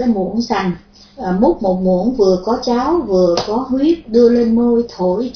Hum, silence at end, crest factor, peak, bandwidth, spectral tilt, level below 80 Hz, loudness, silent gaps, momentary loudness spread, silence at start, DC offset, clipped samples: none; 0.05 s; 14 dB; 0 dBFS; 5.4 kHz; -7 dB/octave; -40 dBFS; -15 LUFS; none; 6 LU; 0 s; under 0.1%; under 0.1%